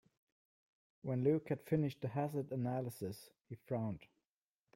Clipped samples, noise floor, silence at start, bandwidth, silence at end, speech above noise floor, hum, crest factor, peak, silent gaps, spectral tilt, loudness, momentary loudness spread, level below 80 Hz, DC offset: under 0.1%; under -90 dBFS; 1.05 s; 16.5 kHz; 0.7 s; over 51 dB; none; 18 dB; -22 dBFS; 3.41-3.45 s; -8.5 dB/octave; -40 LUFS; 16 LU; -76 dBFS; under 0.1%